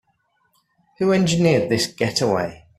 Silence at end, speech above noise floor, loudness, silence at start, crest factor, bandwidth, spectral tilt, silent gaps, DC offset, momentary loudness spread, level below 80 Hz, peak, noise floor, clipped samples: 0.25 s; 48 dB; -19 LUFS; 1 s; 18 dB; 14.5 kHz; -5 dB/octave; none; under 0.1%; 6 LU; -54 dBFS; -4 dBFS; -67 dBFS; under 0.1%